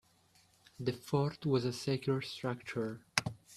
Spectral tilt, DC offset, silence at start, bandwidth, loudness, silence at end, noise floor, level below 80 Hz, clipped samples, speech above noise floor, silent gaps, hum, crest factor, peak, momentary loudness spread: -5 dB/octave; under 0.1%; 0.8 s; 14 kHz; -36 LUFS; 0 s; -68 dBFS; -70 dBFS; under 0.1%; 33 dB; none; none; 30 dB; -6 dBFS; 6 LU